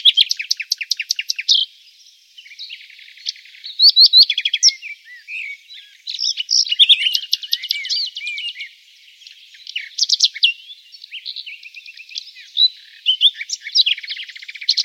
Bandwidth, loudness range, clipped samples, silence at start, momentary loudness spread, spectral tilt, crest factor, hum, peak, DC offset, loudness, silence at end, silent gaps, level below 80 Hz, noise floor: 16.5 kHz; 7 LU; under 0.1%; 0 s; 23 LU; 13.5 dB/octave; 18 dB; none; 0 dBFS; under 0.1%; -14 LUFS; 0 s; none; under -90 dBFS; -49 dBFS